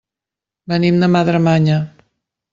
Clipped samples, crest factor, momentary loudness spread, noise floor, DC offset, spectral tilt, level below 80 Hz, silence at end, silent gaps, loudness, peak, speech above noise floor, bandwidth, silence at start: under 0.1%; 14 dB; 8 LU; -87 dBFS; under 0.1%; -8 dB/octave; -52 dBFS; 0.65 s; none; -15 LUFS; -2 dBFS; 73 dB; 7.4 kHz; 0.7 s